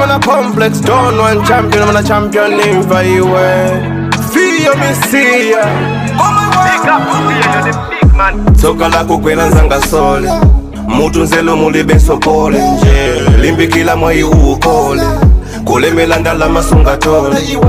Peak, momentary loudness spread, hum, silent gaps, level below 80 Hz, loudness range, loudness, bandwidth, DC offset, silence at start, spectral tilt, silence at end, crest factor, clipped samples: 0 dBFS; 3 LU; none; none; -16 dBFS; 1 LU; -9 LUFS; 16 kHz; under 0.1%; 0 s; -5.5 dB/octave; 0 s; 8 dB; 0.7%